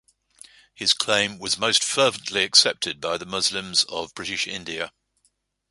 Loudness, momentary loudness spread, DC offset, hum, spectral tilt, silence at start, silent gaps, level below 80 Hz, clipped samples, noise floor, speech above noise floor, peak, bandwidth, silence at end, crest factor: -21 LUFS; 13 LU; under 0.1%; none; -1 dB/octave; 0.8 s; none; -62 dBFS; under 0.1%; -69 dBFS; 45 dB; -2 dBFS; 11.5 kHz; 0.8 s; 24 dB